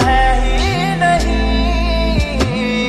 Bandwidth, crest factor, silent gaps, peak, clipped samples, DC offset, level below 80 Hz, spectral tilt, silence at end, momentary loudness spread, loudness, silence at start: 12.5 kHz; 10 dB; none; -2 dBFS; under 0.1%; under 0.1%; -18 dBFS; -5.5 dB/octave; 0 s; 3 LU; -15 LUFS; 0 s